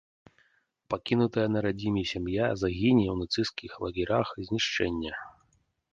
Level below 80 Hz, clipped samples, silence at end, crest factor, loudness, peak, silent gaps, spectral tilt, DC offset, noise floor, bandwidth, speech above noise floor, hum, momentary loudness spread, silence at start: -50 dBFS; under 0.1%; 0.65 s; 18 dB; -29 LUFS; -12 dBFS; none; -6 dB/octave; under 0.1%; -70 dBFS; 7.6 kHz; 42 dB; none; 11 LU; 0.9 s